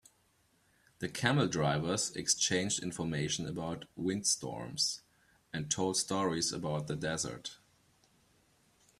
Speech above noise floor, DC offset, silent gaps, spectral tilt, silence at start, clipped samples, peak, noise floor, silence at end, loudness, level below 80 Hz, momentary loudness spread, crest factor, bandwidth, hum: 37 dB; under 0.1%; none; -3.5 dB/octave; 1 s; under 0.1%; -10 dBFS; -72 dBFS; 1.45 s; -33 LUFS; -66 dBFS; 11 LU; 24 dB; 14 kHz; none